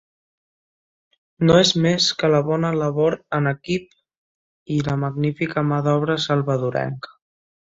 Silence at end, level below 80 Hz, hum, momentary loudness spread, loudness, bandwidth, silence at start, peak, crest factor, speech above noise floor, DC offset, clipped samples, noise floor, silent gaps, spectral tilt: 0.6 s; -54 dBFS; none; 10 LU; -20 LUFS; 7.8 kHz; 1.4 s; -2 dBFS; 18 dB; over 70 dB; under 0.1%; under 0.1%; under -90 dBFS; 4.17-4.66 s; -5.5 dB/octave